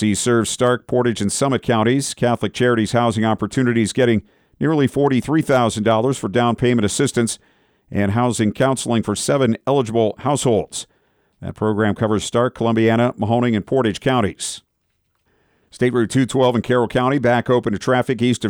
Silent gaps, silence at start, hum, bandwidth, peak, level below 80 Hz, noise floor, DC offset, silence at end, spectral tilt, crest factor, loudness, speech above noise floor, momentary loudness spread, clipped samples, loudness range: none; 0 s; none; 17 kHz; -4 dBFS; -50 dBFS; -69 dBFS; under 0.1%; 0 s; -5.5 dB/octave; 14 dB; -18 LUFS; 51 dB; 5 LU; under 0.1%; 2 LU